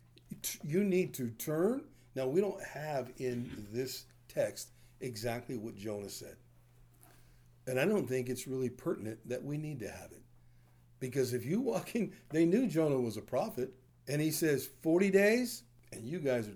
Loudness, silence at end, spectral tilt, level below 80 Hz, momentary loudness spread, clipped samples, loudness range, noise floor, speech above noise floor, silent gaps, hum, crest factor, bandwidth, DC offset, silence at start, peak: -35 LUFS; 0 s; -5.5 dB/octave; -66 dBFS; 15 LU; under 0.1%; 8 LU; -62 dBFS; 28 dB; none; none; 20 dB; over 20 kHz; under 0.1%; 0.3 s; -16 dBFS